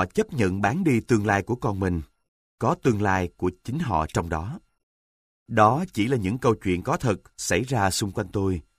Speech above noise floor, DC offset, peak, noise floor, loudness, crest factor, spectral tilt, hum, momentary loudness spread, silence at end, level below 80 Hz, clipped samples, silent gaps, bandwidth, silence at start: over 66 dB; under 0.1%; -6 dBFS; under -90 dBFS; -25 LUFS; 20 dB; -6 dB/octave; none; 7 LU; 0.15 s; -46 dBFS; under 0.1%; 2.28-2.58 s, 4.83-5.46 s; 15.5 kHz; 0 s